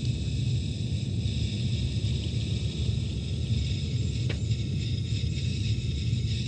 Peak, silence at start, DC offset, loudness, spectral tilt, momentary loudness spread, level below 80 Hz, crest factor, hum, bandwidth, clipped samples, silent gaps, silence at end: -16 dBFS; 0 s; under 0.1%; -30 LUFS; -6 dB/octave; 1 LU; -36 dBFS; 12 dB; none; 9.2 kHz; under 0.1%; none; 0 s